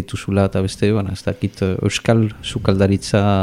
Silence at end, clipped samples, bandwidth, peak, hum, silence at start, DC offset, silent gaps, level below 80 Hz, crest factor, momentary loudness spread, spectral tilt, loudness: 0 s; under 0.1%; 12.5 kHz; -2 dBFS; none; 0 s; under 0.1%; none; -42 dBFS; 16 dB; 6 LU; -6.5 dB/octave; -18 LUFS